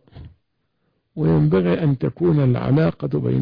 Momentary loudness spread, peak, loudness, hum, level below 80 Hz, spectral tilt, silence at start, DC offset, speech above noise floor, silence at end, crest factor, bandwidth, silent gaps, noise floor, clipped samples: 6 LU; -8 dBFS; -19 LUFS; none; -46 dBFS; -11.5 dB/octave; 0.15 s; under 0.1%; 53 dB; 0 s; 12 dB; 5.2 kHz; none; -71 dBFS; under 0.1%